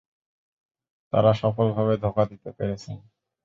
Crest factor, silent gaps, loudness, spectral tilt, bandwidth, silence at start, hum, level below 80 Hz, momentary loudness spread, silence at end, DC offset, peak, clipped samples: 20 dB; none; -24 LUFS; -8.5 dB/octave; 7.4 kHz; 1.15 s; none; -52 dBFS; 14 LU; 0.45 s; under 0.1%; -6 dBFS; under 0.1%